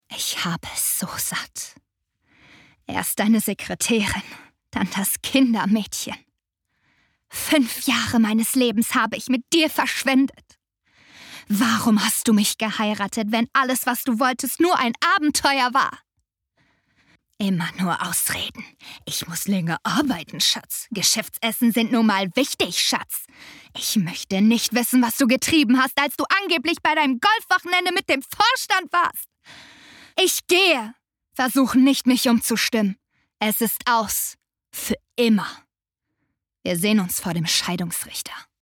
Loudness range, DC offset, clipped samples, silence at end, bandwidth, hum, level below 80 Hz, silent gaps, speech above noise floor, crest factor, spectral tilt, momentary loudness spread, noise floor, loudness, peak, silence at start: 5 LU; under 0.1%; under 0.1%; 0.2 s; 20 kHz; none; -58 dBFS; none; 61 dB; 18 dB; -3 dB/octave; 11 LU; -82 dBFS; -21 LUFS; -4 dBFS; 0.1 s